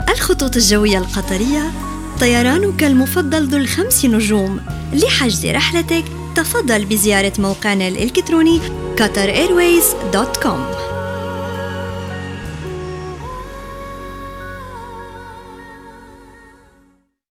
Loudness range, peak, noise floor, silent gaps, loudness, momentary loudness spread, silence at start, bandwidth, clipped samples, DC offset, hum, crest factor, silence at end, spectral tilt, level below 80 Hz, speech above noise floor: 16 LU; -2 dBFS; -55 dBFS; none; -15 LUFS; 18 LU; 0 s; 18.5 kHz; under 0.1%; under 0.1%; none; 16 dB; 0.95 s; -4 dB/octave; -32 dBFS; 40 dB